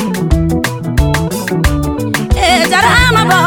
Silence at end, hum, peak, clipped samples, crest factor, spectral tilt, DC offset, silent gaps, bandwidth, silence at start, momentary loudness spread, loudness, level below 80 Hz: 0 s; none; 0 dBFS; under 0.1%; 12 dB; -4.5 dB/octave; under 0.1%; none; over 20 kHz; 0 s; 8 LU; -12 LUFS; -20 dBFS